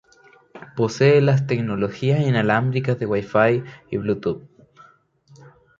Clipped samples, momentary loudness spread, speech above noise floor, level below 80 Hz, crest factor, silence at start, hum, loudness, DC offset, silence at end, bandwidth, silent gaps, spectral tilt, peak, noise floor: under 0.1%; 11 LU; 34 dB; -56 dBFS; 18 dB; 0.55 s; none; -20 LUFS; under 0.1%; 1.35 s; 7.6 kHz; none; -7.5 dB/octave; -4 dBFS; -54 dBFS